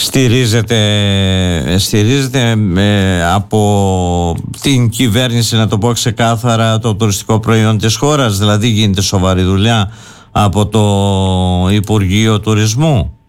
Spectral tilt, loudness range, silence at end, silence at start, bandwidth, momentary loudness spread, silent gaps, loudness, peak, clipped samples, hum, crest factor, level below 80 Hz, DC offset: -5 dB/octave; 1 LU; 0.15 s; 0 s; 16.5 kHz; 3 LU; none; -12 LUFS; -2 dBFS; under 0.1%; none; 8 dB; -34 dBFS; under 0.1%